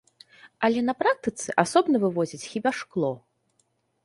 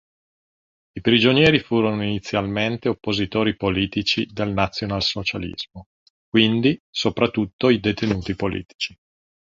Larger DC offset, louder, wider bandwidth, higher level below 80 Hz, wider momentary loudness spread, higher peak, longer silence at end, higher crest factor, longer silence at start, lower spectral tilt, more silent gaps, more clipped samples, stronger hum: neither; second, -25 LUFS vs -21 LUFS; first, 11.5 kHz vs 7.6 kHz; second, -68 dBFS vs -46 dBFS; second, 8 LU vs 11 LU; about the same, -4 dBFS vs -2 dBFS; first, 0.85 s vs 0.55 s; about the same, 22 dB vs 20 dB; second, 0.45 s vs 0.95 s; about the same, -5 dB/octave vs -6 dB/octave; second, none vs 5.86-6.32 s, 6.80-6.93 s, 7.53-7.59 s, 8.74-8.79 s; neither; neither